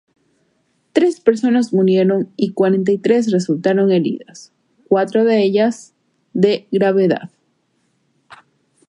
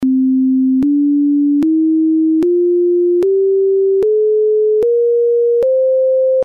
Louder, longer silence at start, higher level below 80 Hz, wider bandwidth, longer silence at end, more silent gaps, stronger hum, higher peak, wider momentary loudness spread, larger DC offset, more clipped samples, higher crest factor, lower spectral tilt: second, -16 LUFS vs -13 LUFS; first, 0.95 s vs 0 s; second, -68 dBFS vs -56 dBFS; first, 10.5 kHz vs 3.6 kHz; first, 1.65 s vs 0 s; neither; neither; first, 0 dBFS vs -8 dBFS; first, 7 LU vs 0 LU; neither; neither; first, 16 dB vs 4 dB; second, -7 dB/octave vs -9.5 dB/octave